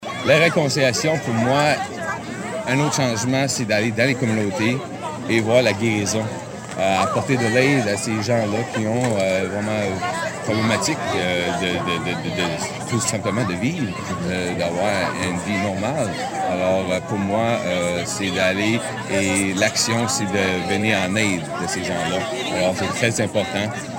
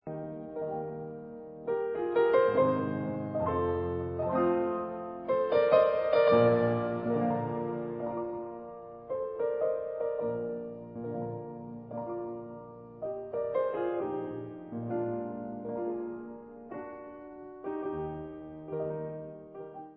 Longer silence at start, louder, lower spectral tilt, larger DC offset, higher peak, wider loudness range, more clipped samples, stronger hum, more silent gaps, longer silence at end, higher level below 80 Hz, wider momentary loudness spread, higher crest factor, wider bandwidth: about the same, 0 s vs 0.05 s; first, -20 LUFS vs -32 LUFS; second, -4.5 dB/octave vs -11 dB/octave; neither; first, -4 dBFS vs -10 dBFS; second, 3 LU vs 12 LU; neither; neither; neither; about the same, 0 s vs 0 s; about the same, -56 dBFS vs -58 dBFS; second, 7 LU vs 19 LU; about the same, 18 dB vs 22 dB; first, 16.5 kHz vs 5.2 kHz